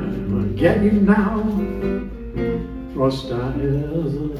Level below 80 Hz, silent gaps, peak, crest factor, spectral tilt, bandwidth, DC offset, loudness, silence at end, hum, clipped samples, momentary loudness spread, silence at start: -34 dBFS; none; -4 dBFS; 16 dB; -8.5 dB/octave; 10.5 kHz; under 0.1%; -21 LUFS; 0 s; none; under 0.1%; 10 LU; 0 s